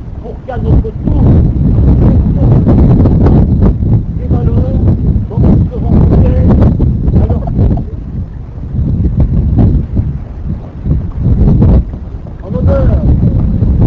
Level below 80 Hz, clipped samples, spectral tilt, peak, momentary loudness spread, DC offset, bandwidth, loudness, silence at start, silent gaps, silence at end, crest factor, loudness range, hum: -12 dBFS; 0.2%; -12 dB/octave; 0 dBFS; 13 LU; under 0.1%; 4.3 kHz; -10 LUFS; 0 s; none; 0 s; 8 dB; 5 LU; none